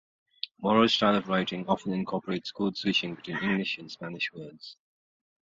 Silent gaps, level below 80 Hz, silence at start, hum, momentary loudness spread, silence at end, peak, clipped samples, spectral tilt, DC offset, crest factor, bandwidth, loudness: none; -66 dBFS; 0.45 s; none; 17 LU; 0.7 s; -8 dBFS; under 0.1%; -5.5 dB/octave; under 0.1%; 22 dB; 7.6 kHz; -28 LUFS